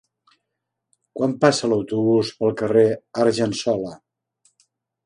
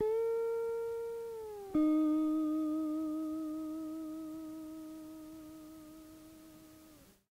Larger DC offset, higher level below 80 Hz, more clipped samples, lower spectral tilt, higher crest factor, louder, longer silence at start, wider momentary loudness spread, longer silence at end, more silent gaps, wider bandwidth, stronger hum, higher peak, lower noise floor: neither; first, -62 dBFS vs -68 dBFS; neither; about the same, -5.5 dB/octave vs -6.5 dB/octave; first, 22 dB vs 14 dB; first, -20 LUFS vs -36 LUFS; first, 1.15 s vs 0 s; second, 8 LU vs 23 LU; first, 1.1 s vs 0.25 s; neither; second, 11 kHz vs 16 kHz; neither; first, 0 dBFS vs -22 dBFS; first, -80 dBFS vs -60 dBFS